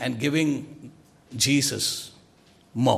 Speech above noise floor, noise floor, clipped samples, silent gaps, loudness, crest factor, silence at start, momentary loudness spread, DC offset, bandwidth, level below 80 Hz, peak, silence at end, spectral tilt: 32 dB; -57 dBFS; under 0.1%; none; -24 LUFS; 20 dB; 0 s; 21 LU; under 0.1%; 16 kHz; -62 dBFS; -6 dBFS; 0 s; -4 dB/octave